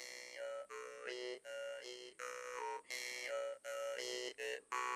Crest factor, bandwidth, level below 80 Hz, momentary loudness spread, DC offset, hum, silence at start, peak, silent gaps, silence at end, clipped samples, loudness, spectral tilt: 22 dB; 14 kHz; under -90 dBFS; 6 LU; under 0.1%; none; 0 s; -24 dBFS; none; 0 s; under 0.1%; -46 LUFS; 0.5 dB/octave